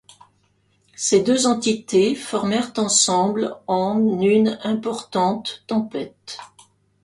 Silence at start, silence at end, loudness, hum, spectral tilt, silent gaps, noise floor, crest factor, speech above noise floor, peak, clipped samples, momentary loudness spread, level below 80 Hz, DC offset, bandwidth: 1 s; 0.55 s; -20 LUFS; 50 Hz at -50 dBFS; -3.5 dB/octave; none; -63 dBFS; 18 dB; 43 dB; -4 dBFS; under 0.1%; 12 LU; -64 dBFS; under 0.1%; 11.5 kHz